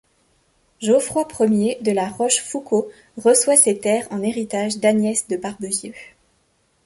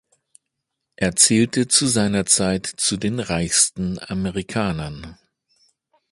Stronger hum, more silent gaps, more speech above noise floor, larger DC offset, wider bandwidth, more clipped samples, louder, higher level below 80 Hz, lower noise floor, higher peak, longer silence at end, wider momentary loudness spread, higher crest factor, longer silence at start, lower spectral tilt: neither; neither; second, 44 dB vs 59 dB; neither; about the same, 12 kHz vs 12 kHz; neither; about the same, -19 LUFS vs -19 LUFS; second, -60 dBFS vs -46 dBFS; second, -64 dBFS vs -79 dBFS; about the same, 0 dBFS vs 0 dBFS; second, 0.8 s vs 1 s; about the same, 12 LU vs 11 LU; about the same, 20 dB vs 22 dB; second, 0.8 s vs 1 s; about the same, -3.5 dB/octave vs -3 dB/octave